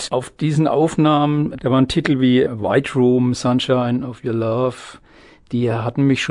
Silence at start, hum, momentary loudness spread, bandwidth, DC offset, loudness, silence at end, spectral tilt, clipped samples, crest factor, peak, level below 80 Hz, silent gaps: 0 s; none; 7 LU; 11 kHz; under 0.1%; -18 LUFS; 0 s; -6.5 dB/octave; under 0.1%; 16 dB; -2 dBFS; -48 dBFS; none